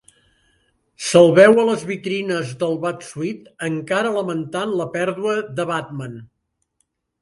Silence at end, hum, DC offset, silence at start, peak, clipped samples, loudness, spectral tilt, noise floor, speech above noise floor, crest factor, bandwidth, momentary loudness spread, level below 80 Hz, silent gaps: 0.95 s; none; under 0.1%; 1 s; 0 dBFS; under 0.1%; -19 LUFS; -5 dB/octave; -70 dBFS; 52 dB; 20 dB; 11.5 kHz; 16 LU; -62 dBFS; none